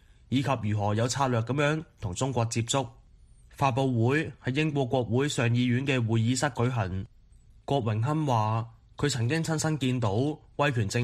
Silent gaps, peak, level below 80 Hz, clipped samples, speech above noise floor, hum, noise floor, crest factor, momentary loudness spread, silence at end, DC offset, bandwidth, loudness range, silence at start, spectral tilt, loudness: none; -10 dBFS; -56 dBFS; under 0.1%; 28 dB; none; -55 dBFS; 18 dB; 6 LU; 0 s; under 0.1%; 12.5 kHz; 2 LU; 0.3 s; -5.5 dB/octave; -28 LUFS